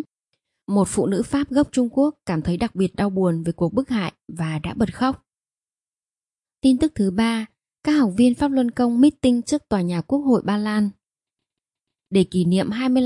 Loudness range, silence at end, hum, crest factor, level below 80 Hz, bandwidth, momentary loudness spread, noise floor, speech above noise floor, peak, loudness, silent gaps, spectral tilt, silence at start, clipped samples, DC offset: 5 LU; 0 s; none; 16 dB; -50 dBFS; 11.5 kHz; 8 LU; under -90 dBFS; over 70 dB; -6 dBFS; -21 LUFS; none; -6.5 dB/octave; 0 s; under 0.1%; under 0.1%